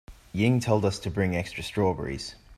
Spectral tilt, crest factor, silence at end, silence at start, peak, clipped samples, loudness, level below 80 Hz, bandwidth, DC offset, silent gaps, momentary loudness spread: -6 dB/octave; 18 dB; 0.05 s; 0.1 s; -8 dBFS; under 0.1%; -27 LUFS; -50 dBFS; 14 kHz; under 0.1%; none; 10 LU